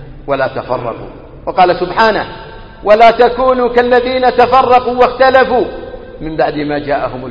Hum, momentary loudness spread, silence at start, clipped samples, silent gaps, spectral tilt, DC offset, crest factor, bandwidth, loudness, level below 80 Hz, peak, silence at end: none; 17 LU; 0 s; 0.2%; none; -6.5 dB/octave; under 0.1%; 12 dB; 7 kHz; -11 LUFS; -34 dBFS; 0 dBFS; 0 s